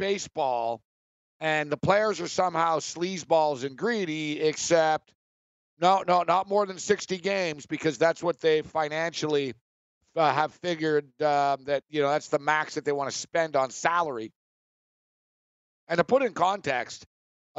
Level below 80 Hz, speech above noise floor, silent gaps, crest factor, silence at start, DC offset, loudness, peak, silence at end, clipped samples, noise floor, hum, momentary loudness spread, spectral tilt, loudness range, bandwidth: -70 dBFS; over 64 dB; 0.85-1.40 s, 5.15-5.77 s, 9.61-10.01 s, 14.36-15.87 s; 22 dB; 0 s; under 0.1%; -27 LUFS; -6 dBFS; 0.55 s; under 0.1%; under -90 dBFS; none; 7 LU; -4 dB/octave; 3 LU; 8.2 kHz